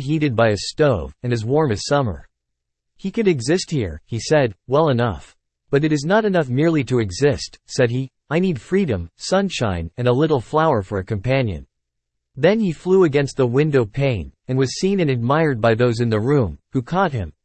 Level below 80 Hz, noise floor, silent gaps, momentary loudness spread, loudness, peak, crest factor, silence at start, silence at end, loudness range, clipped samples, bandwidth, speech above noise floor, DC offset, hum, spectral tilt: -46 dBFS; -78 dBFS; none; 8 LU; -19 LUFS; -2 dBFS; 18 dB; 0 s; 0.15 s; 2 LU; under 0.1%; 8.8 kHz; 59 dB; under 0.1%; none; -6.5 dB/octave